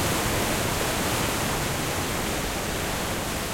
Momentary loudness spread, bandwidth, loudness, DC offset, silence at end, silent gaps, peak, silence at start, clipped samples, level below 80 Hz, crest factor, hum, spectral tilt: 3 LU; 16.5 kHz; -26 LUFS; under 0.1%; 0 s; none; -12 dBFS; 0 s; under 0.1%; -38 dBFS; 14 dB; none; -3.5 dB/octave